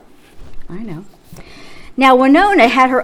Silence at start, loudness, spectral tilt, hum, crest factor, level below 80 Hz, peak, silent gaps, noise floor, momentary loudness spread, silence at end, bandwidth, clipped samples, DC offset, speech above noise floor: 0.35 s; -10 LUFS; -5 dB/octave; none; 14 dB; -38 dBFS; 0 dBFS; none; -35 dBFS; 23 LU; 0 s; 14 kHz; under 0.1%; under 0.1%; 23 dB